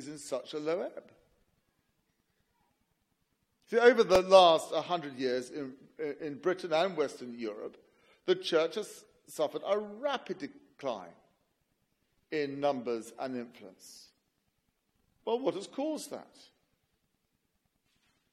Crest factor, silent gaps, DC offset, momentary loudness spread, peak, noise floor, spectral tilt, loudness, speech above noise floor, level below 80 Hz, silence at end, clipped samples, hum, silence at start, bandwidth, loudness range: 26 dB; none; under 0.1%; 21 LU; -8 dBFS; -79 dBFS; -4 dB/octave; -31 LUFS; 48 dB; -70 dBFS; 2.1 s; under 0.1%; none; 0 s; 15 kHz; 12 LU